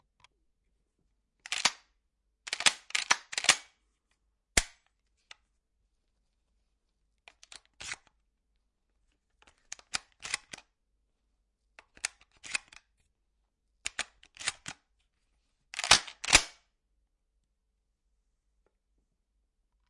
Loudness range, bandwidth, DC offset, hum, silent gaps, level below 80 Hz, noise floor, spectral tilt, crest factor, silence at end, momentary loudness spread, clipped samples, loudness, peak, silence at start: 21 LU; 11.5 kHz; under 0.1%; none; none; -56 dBFS; -79 dBFS; 0.5 dB/octave; 32 dB; 3.4 s; 23 LU; under 0.1%; -29 LUFS; -4 dBFS; 1.5 s